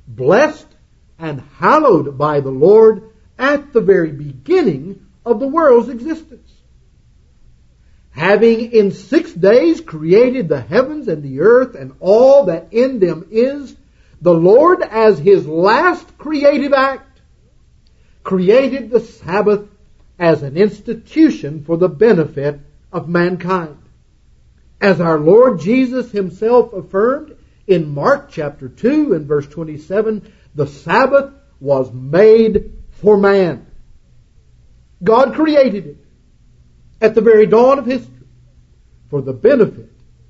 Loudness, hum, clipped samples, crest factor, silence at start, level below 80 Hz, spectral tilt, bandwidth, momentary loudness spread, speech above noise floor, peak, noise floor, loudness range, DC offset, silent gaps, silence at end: -13 LUFS; none; under 0.1%; 14 dB; 0.1 s; -46 dBFS; -7.5 dB/octave; 7.6 kHz; 15 LU; 37 dB; 0 dBFS; -49 dBFS; 5 LU; under 0.1%; none; 0.45 s